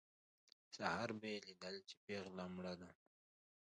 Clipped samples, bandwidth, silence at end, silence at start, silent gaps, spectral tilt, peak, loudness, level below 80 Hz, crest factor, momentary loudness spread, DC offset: under 0.1%; 10 kHz; 0.7 s; 0.7 s; 1.97-2.08 s; -4.5 dB/octave; -26 dBFS; -49 LUFS; -78 dBFS; 26 dB; 11 LU; under 0.1%